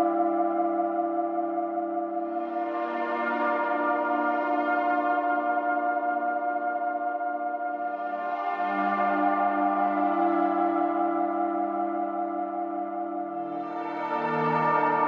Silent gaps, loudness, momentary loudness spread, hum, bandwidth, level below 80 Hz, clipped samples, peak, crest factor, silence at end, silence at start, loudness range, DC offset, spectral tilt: none; -27 LUFS; 7 LU; none; 5.6 kHz; under -90 dBFS; under 0.1%; -12 dBFS; 16 dB; 0 s; 0 s; 3 LU; under 0.1%; -8.5 dB/octave